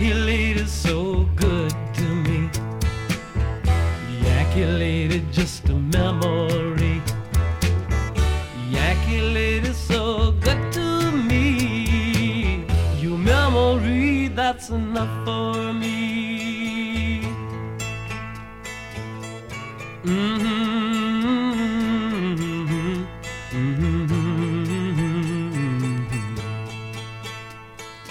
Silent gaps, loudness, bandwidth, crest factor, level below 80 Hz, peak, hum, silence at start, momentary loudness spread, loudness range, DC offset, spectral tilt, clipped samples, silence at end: none; -23 LUFS; 16.5 kHz; 16 dB; -28 dBFS; -6 dBFS; none; 0 s; 12 LU; 6 LU; under 0.1%; -6 dB/octave; under 0.1%; 0 s